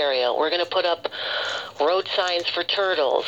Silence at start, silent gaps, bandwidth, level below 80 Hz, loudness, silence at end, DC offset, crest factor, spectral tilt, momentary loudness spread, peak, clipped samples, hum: 0 s; none; 8.4 kHz; -70 dBFS; -23 LUFS; 0 s; under 0.1%; 16 dB; -2 dB/octave; 5 LU; -6 dBFS; under 0.1%; none